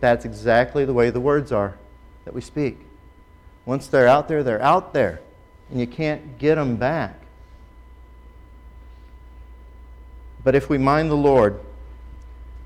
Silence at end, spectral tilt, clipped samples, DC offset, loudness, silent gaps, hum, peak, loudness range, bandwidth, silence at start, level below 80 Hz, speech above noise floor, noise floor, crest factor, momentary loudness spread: 0 s; -7.5 dB/octave; under 0.1%; under 0.1%; -20 LUFS; none; none; -6 dBFS; 7 LU; 13 kHz; 0 s; -42 dBFS; 29 dB; -48 dBFS; 16 dB; 22 LU